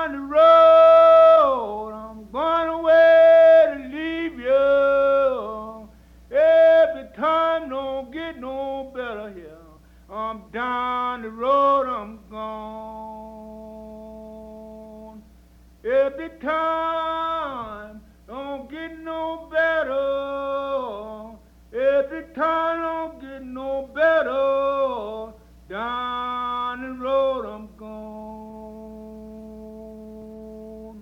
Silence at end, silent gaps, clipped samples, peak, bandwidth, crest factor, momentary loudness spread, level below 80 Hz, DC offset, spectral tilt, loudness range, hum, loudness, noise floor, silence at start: 0 s; none; under 0.1%; -6 dBFS; 5.8 kHz; 16 dB; 26 LU; -52 dBFS; under 0.1%; -5.5 dB/octave; 13 LU; 60 Hz at -55 dBFS; -19 LUFS; -51 dBFS; 0 s